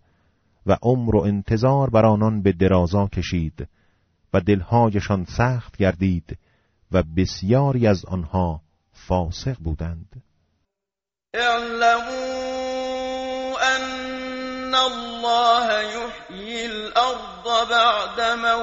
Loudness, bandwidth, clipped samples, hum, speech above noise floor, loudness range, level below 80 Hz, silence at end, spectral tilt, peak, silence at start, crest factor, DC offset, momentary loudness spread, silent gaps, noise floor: -21 LUFS; 8 kHz; under 0.1%; none; 68 dB; 5 LU; -40 dBFS; 0 s; -4.5 dB/octave; -4 dBFS; 0.65 s; 18 dB; under 0.1%; 12 LU; none; -88 dBFS